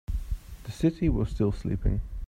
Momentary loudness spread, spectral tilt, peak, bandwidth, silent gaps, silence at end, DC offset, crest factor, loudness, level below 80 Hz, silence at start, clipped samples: 13 LU; -8.5 dB/octave; -12 dBFS; 15.5 kHz; none; 0 s; under 0.1%; 16 dB; -29 LUFS; -34 dBFS; 0.1 s; under 0.1%